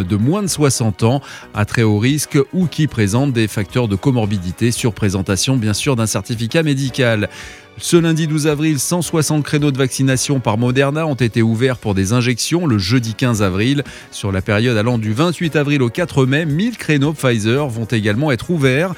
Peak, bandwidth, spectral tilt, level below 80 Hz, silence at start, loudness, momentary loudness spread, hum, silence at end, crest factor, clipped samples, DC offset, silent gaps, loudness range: 0 dBFS; 16.5 kHz; -5.5 dB/octave; -44 dBFS; 0 s; -16 LUFS; 4 LU; none; 0 s; 16 dB; under 0.1%; under 0.1%; none; 1 LU